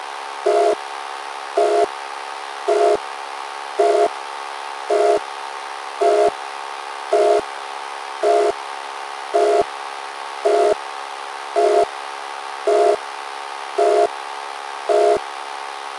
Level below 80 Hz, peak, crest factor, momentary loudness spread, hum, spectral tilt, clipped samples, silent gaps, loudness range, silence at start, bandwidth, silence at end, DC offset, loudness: -66 dBFS; -4 dBFS; 18 dB; 13 LU; none; -2 dB/octave; under 0.1%; none; 1 LU; 0 s; 11.5 kHz; 0 s; under 0.1%; -21 LUFS